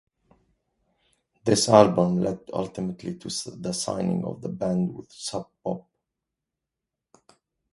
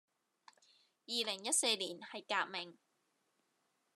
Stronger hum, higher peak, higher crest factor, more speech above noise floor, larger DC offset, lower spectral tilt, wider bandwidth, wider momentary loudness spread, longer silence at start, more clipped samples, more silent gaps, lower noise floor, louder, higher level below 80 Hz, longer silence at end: neither; first, 0 dBFS vs -18 dBFS; about the same, 26 dB vs 24 dB; first, 62 dB vs 42 dB; neither; first, -5 dB/octave vs 0 dB/octave; second, 11.5 kHz vs 13 kHz; about the same, 16 LU vs 14 LU; first, 1.45 s vs 1.1 s; neither; neither; first, -86 dBFS vs -81 dBFS; first, -25 LUFS vs -36 LUFS; first, -60 dBFS vs under -90 dBFS; first, 1.95 s vs 1.25 s